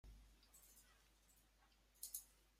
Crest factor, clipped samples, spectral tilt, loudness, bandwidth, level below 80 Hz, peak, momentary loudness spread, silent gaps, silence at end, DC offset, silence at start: 28 dB; under 0.1%; -1 dB/octave; -55 LUFS; 16 kHz; -72 dBFS; -34 dBFS; 16 LU; none; 0 s; under 0.1%; 0.05 s